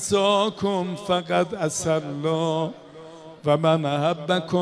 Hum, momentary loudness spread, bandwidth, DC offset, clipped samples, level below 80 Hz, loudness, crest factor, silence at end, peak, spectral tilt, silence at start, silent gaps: none; 11 LU; 11 kHz; under 0.1%; under 0.1%; -60 dBFS; -23 LUFS; 16 dB; 0 s; -8 dBFS; -5 dB/octave; 0 s; none